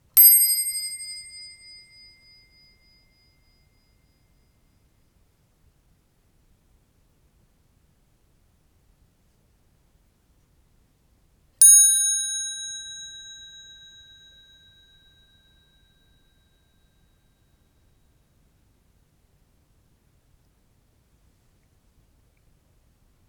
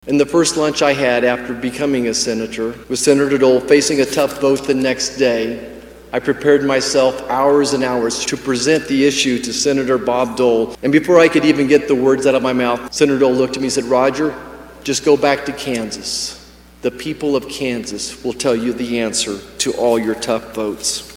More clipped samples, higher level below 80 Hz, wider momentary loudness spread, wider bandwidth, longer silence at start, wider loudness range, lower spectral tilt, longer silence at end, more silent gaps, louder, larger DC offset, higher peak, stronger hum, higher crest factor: neither; second, -64 dBFS vs -48 dBFS; first, 31 LU vs 9 LU; first, over 20 kHz vs 16.5 kHz; about the same, 0.15 s vs 0.05 s; first, 23 LU vs 6 LU; second, 3.5 dB/octave vs -3.5 dB/octave; first, 10.1 s vs 0 s; neither; about the same, -15 LUFS vs -16 LUFS; neither; about the same, -2 dBFS vs 0 dBFS; neither; first, 26 dB vs 16 dB